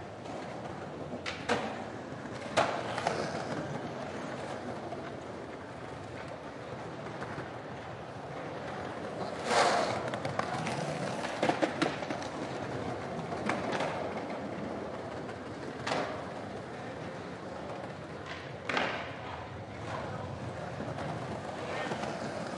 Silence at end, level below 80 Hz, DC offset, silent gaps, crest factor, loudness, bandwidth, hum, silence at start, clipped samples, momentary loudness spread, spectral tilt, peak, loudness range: 0 s; -66 dBFS; under 0.1%; none; 24 dB; -36 LUFS; 11.5 kHz; none; 0 s; under 0.1%; 11 LU; -5 dB/octave; -12 dBFS; 9 LU